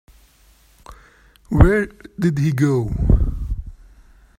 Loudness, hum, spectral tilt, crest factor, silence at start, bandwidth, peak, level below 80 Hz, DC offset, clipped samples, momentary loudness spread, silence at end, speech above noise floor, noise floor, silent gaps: -19 LUFS; none; -8.5 dB/octave; 20 dB; 0.9 s; 14 kHz; 0 dBFS; -24 dBFS; under 0.1%; under 0.1%; 15 LU; 0.7 s; 37 dB; -53 dBFS; none